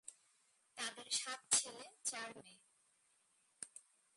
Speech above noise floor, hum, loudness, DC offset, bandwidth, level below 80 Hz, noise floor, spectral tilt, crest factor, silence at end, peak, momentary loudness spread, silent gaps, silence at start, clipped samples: 34 dB; none; -40 LUFS; under 0.1%; 11.5 kHz; under -90 dBFS; -77 dBFS; 1.5 dB/octave; 28 dB; 0.35 s; -20 dBFS; 22 LU; none; 0.05 s; under 0.1%